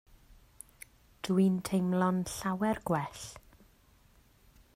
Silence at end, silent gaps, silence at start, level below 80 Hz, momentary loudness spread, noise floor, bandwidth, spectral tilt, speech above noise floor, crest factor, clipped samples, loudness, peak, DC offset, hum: 1.35 s; none; 1.25 s; -60 dBFS; 24 LU; -63 dBFS; 16 kHz; -6 dB/octave; 33 dB; 18 dB; under 0.1%; -31 LUFS; -16 dBFS; under 0.1%; none